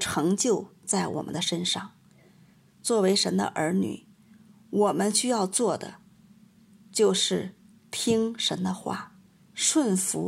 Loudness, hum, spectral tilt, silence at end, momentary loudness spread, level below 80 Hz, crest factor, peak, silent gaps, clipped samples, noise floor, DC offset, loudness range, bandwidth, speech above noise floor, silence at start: -26 LUFS; none; -3.5 dB/octave; 0 s; 12 LU; -68 dBFS; 18 dB; -10 dBFS; none; under 0.1%; -57 dBFS; under 0.1%; 2 LU; 16 kHz; 32 dB; 0 s